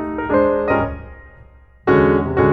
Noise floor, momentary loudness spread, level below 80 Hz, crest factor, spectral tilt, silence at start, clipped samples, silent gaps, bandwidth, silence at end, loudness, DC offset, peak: -45 dBFS; 11 LU; -36 dBFS; 16 dB; -10 dB/octave; 0 s; under 0.1%; none; 5.8 kHz; 0 s; -17 LUFS; under 0.1%; -2 dBFS